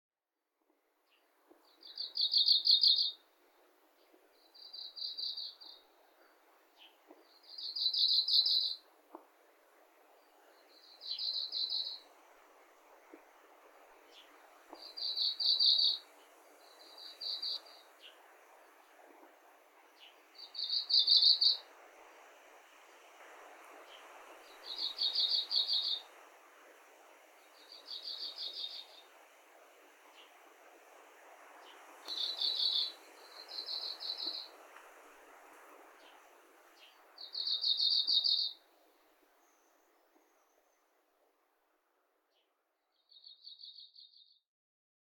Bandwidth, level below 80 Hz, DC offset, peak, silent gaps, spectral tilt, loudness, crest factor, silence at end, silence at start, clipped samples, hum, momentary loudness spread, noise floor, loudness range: 18 kHz; under -90 dBFS; under 0.1%; -12 dBFS; none; 3.5 dB/octave; -31 LUFS; 26 dB; 1.05 s; 1.85 s; under 0.1%; none; 28 LU; -89 dBFS; 15 LU